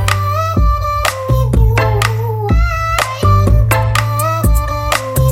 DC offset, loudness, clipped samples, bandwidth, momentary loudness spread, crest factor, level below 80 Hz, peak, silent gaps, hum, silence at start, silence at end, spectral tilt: under 0.1%; -14 LUFS; under 0.1%; 17 kHz; 4 LU; 12 dB; -18 dBFS; 0 dBFS; none; none; 0 s; 0 s; -5.5 dB/octave